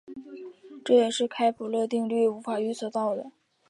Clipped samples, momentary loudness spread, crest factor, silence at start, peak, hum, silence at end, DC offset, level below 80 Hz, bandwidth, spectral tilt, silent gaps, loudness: under 0.1%; 21 LU; 18 dB; 0.1 s; -10 dBFS; none; 0.4 s; under 0.1%; -80 dBFS; 11.5 kHz; -4.5 dB/octave; none; -26 LUFS